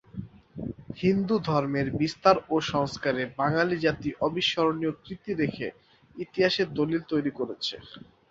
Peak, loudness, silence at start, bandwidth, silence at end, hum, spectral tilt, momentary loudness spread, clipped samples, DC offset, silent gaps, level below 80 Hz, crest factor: -6 dBFS; -27 LUFS; 0.15 s; 7.8 kHz; 0.3 s; none; -6 dB/octave; 14 LU; under 0.1%; under 0.1%; none; -56 dBFS; 22 dB